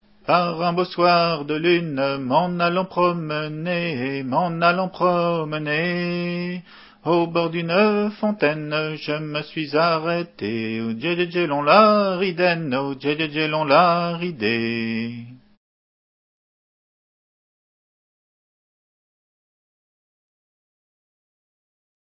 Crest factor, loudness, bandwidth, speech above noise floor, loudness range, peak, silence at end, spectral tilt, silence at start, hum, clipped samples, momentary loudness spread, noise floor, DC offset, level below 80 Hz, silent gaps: 22 dB; -21 LUFS; 5.8 kHz; over 69 dB; 5 LU; 0 dBFS; 6.7 s; -10 dB/octave; 0.25 s; none; under 0.1%; 10 LU; under -90 dBFS; under 0.1%; -66 dBFS; none